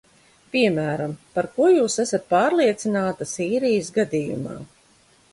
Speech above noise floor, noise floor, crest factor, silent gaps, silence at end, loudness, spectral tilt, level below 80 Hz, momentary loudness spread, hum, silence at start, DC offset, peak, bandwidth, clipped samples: 36 dB; -57 dBFS; 16 dB; none; 0.65 s; -22 LUFS; -5 dB/octave; -62 dBFS; 10 LU; none; 0.55 s; under 0.1%; -6 dBFS; 11.5 kHz; under 0.1%